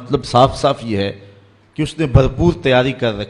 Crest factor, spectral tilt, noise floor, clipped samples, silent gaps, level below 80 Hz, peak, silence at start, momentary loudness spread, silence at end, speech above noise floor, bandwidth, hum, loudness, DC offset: 16 dB; -6.5 dB/octave; -46 dBFS; under 0.1%; none; -30 dBFS; 0 dBFS; 0 s; 11 LU; 0 s; 31 dB; 11.5 kHz; none; -16 LUFS; under 0.1%